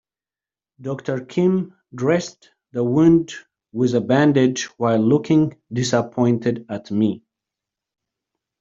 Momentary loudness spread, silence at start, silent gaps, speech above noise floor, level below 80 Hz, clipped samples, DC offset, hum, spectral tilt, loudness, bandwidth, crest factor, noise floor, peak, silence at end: 16 LU; 0.8 s; none; over 71 dB; -58 dBFS; under 0.1%; under 0.1%; none; -6.5 dB/octave; -19 LUFS; 7.8 kHz; 18 dB; under -90 dBFS; -4 dBFS; 1.45 s